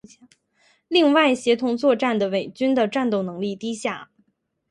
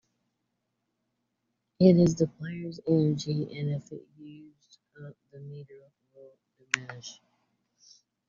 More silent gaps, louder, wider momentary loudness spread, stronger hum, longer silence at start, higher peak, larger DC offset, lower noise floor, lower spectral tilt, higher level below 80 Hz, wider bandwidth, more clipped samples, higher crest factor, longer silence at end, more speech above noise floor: neither; first, -21 LUFS vs -27 LUFS; second, 11 LU vs 27 LU; neither; second, 0.9 s vs 1.8 s; about the same, -4 dBFS vs -4 dBFS; neither; second, -69 dBFS vs -81 dBFS; second, -5 dB/octave vs -7 dB/octave; second, -70 dBFS vs -64 dBFS; first, 11.5 kHz vs 7.4 kHz; neither; second, 18 dB vs 28 dB; second, 0.65 s vs 1.15 s; second, 48 dB vs 53 dB